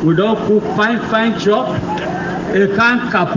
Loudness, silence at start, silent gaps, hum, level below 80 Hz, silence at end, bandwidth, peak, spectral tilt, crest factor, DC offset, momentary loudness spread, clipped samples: -15 LUFS; 0 s; none; none; -44 dBFS; 0 s; 7.6 kHz; -2 dBFS; -6.5 dB/octave; 12 dB; under 0.1%; 8 LU; under 0.1%